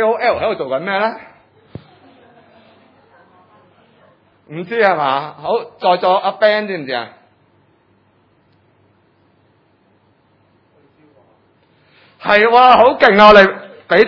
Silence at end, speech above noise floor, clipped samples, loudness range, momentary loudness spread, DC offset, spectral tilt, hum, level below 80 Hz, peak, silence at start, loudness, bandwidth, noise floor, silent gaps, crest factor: 0 s; 43 dB; 0.3%; 16 LU; 17 LU; under 0.1%; -6 dB/octave; none; -50 dBFS; 0 dBFS; 0 s; -12 LUFS; 6 kHz; -56 dBFS; none; 16 dB